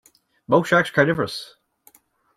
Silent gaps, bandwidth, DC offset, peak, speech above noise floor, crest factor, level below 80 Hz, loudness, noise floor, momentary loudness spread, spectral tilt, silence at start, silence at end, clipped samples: none; 15.5 kHz; under 0.1%; -2 dBFS; 37 dB; 20 dB; -60 dBFS; -20 LUFS; -57 dBFS; 15 LU; -5.5 dB/octave; 0.5 s; 0.9 s; under 0.1%